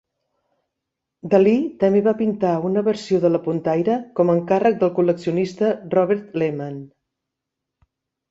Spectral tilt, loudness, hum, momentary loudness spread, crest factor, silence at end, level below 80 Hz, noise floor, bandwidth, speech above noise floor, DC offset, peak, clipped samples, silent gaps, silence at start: -8 dB/octave; -20 LUFS; none; 6 LU; 18 dB; 1.45 s; -64 dBFS; -82 dBFS; 8 kHz; 63 dB; under 0.1%; -2 dBFS; under 0.1%; none; 1.25 s